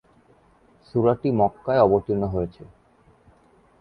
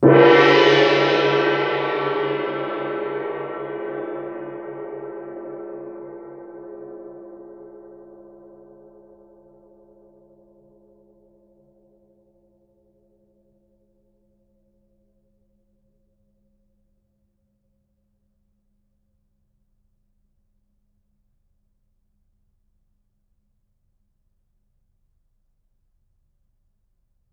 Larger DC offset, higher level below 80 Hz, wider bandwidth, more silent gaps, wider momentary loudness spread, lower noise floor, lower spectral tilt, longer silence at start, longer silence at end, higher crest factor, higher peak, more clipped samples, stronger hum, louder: neither; first, -48 dBFS vs -66 dBFS; second, 5.2 kHz vs 7.2 kHz; neither; second, 10 LU vs 26 LU; second, -58 dBFS vs -68 dBFS; first, -10.5 dB/octave vs -6 dB/octave; first, 0.95 s vs 0 s; second, 1.15 s vs 19.4 s; second, 20 dB vs 26 dB; second, -4 dBFS vs 0 dBFS; neither; neither; second, -22 LUFS vs -19 LUFS